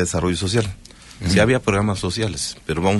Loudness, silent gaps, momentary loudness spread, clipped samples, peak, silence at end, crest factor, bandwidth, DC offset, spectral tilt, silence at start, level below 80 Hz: -20 LUFS; none; 11 LU; under 0.1%; -4 dBFS; 0 s; 16 dB; 11.5 kHz; under 0.1%; -5 dB/octave; 0 s; -38 dBFS